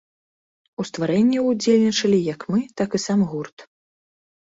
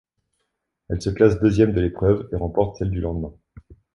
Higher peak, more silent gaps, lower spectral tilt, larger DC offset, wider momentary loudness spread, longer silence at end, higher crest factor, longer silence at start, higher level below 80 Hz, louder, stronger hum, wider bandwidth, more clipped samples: second, -6 dBFS vs -2 dBFS; first, 3.53-3.57 s vs none; second, -5.5 dB/octave vs -8.5 dB/octave; neither; about the same, 14 LU vs 12 LU; first, 0.85 s vs 0.65 s; about the same, 16 dB vs 20 dB; about the same, 0.8 s vs 0.9 s; second, -62 dBFS vs -36 dBFS; about the same, -21 LUFS vs -21 LUFS; neither; second, 8 kHz vs 11 kHz; neither